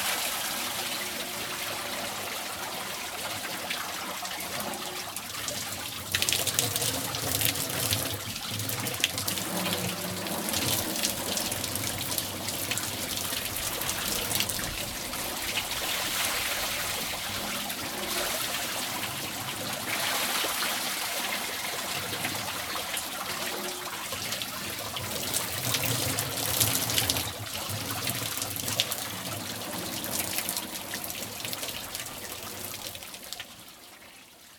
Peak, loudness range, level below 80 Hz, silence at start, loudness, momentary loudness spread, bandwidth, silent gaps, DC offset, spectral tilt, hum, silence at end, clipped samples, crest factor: -2 dBFS; 5 LU; -56 dBFS; 0 s; -29 LUFS; 7 LU; over 20 kHz; none; under 0.1%; -1.5 dB/octave; none; 0 s; under 0.1%; 30 dB